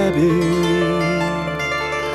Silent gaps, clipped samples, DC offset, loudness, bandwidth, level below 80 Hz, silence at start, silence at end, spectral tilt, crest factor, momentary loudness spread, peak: none; under 0.1%; under 0.1%; -18 LUFS; 13 kHz; -42 dBFS; 0 s; 0 s; -6 dB/octave; 12 dB; 5 LU; -6 dBFS